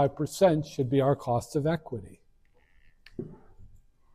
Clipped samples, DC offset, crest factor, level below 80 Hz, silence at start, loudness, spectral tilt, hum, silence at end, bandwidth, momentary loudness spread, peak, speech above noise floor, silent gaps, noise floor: under 0.1%; under 0.1%; 20 dB; -56 dBFS; 0 s; -27 LUFS; -7 dB/octave; none; 0.5 s; 15.5 kHz; 18 LU; -10 dBFS; 35 dB; none; -62 dBFS